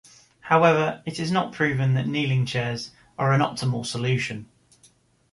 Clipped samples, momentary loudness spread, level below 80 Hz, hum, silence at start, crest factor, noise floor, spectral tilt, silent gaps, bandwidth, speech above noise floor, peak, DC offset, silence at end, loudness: under 0.1%; 12 LU; -58 dBFS; none; 0.45 s; 20 dB; -59 dBFS; -6 dB/octave; none; 11.5 kHz; 36 dB; -4 dBFS; under 0.1%; 0.9 s; -23 LUFS